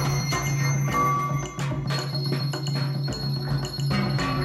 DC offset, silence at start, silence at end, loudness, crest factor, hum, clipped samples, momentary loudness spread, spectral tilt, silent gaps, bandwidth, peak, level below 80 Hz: under 0.1%; 0 s; 0 s; -26 LUFS; 14 dB; none; under 0.1%; 5 LU; -5 dB/octave; none; 12.5 kHz; -12 dBFS; -44 dBFS